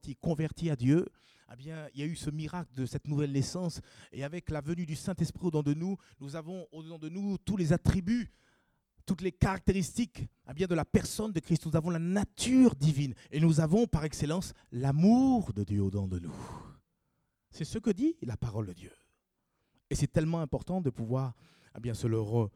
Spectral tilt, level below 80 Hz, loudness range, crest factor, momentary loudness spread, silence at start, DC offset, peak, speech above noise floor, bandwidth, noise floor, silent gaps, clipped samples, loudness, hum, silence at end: -7 dB/octave; -50 dBFS; 8 LU; 20 dB; 16 LU; 0.05 s; under 0.1%; -12 dBFS; 49 dB; 14.5 kHz; -80 dBFS; none; under 0.1%; -31 LUFS; none; 0.05 s